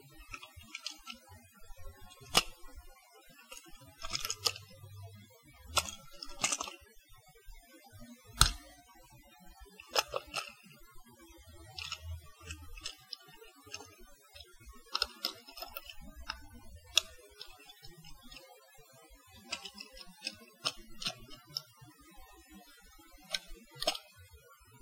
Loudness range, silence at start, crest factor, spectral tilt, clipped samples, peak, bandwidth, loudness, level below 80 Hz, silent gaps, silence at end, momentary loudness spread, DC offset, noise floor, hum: 11 LU; 0 s; 42 dB; -1 dB/octave; under 0.1%; -2 dBFS; 16.5 kHz; -37 LUFS; -54 dBFS; none; 0 s; 25 LU; under 0.1%; -59 dBFS; none